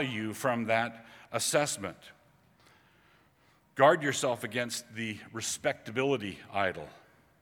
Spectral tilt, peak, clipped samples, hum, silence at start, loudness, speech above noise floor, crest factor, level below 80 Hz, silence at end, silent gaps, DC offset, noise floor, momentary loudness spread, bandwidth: -3.5 dB/octave; -8 dBFS; under 0.1%; none; 0 s; -31 LUFS; 35 dB; 24 dB; -72 dBFS; 0.45 s; none; under 0.1%; -66 dBFS; 13 LU; 19.5 kHz